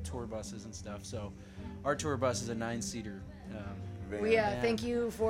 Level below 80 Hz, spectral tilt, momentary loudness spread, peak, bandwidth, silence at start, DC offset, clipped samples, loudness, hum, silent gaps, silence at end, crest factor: -52 dBFS; -5 dB/octave; 15 LU; -16 dBFS; 16 kHz; 0 s; under 0.1%; under 0.1%; -35 LUFS; none; none; 0 s; 20 dB